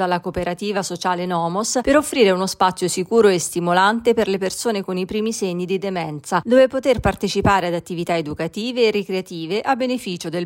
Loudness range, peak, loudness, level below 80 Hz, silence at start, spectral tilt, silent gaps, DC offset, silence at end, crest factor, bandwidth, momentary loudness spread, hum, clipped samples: 3 LU; -4 dBFS; -20 LUFS; -44 dBFS; 0 s; -4.5 dB/octave; none; under 0.1%; 0 s; 16 dB; 16.5 kHz; 9 LU; none; under 0.1%